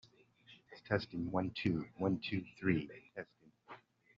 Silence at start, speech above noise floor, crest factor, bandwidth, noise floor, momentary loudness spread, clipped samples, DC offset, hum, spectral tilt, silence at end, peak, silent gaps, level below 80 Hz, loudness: 0.5 s; 27 dB; 22 dB; 7.4 kHz; -65 dBFS; 21 LU; under 0.1%; under 0.1%; none; -5.5 dB/octave; 0.4 s; -18 dBFS; none; -68 dBFS; -38 LUFS